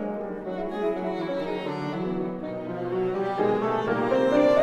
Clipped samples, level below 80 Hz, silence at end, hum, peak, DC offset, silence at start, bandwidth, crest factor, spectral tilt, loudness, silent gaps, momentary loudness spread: under 0.1%; -56 dBFS; 0 s; none; -10 dBFS; under 0.1%; 0 s; 11.5 kHz; 16 dB; -7.5 dB/octave; -27 LUFS; none; 10 LU